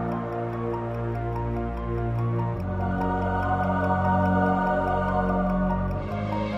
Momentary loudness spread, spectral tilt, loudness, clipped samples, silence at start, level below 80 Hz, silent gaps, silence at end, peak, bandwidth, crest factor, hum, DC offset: 7 LU; -9.5 dB/octave; -26 LUFS; under 0.1%; 0 s; -38 dBFS; none; 0 s; -12 dBFS; 6 kHz; 14 dB; none; under 0.1%